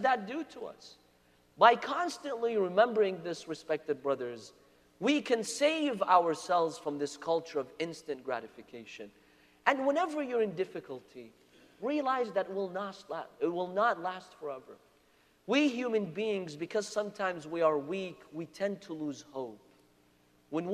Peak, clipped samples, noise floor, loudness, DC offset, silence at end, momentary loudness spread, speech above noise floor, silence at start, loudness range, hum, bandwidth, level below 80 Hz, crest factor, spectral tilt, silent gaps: -8 dBFS; under 0.1%; -67 dBFS; -32 LUFS; under 0.1%; 0 s; 17 LU; 35 dB; 0 s; 6 LU; none; 14 kHz; -78 dBFS; 26 dB; -4.5 dB/octave; none